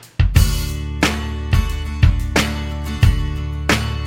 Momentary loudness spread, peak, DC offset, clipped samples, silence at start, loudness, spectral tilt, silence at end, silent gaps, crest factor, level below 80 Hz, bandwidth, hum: 8 LU; 0 dBFS; under 0.1%; under 0.1%; 0.05 s; -19 LUFS; -5 dB/octave; 0 s; none; 16 dB; -20 dBFS; 17 kHz; none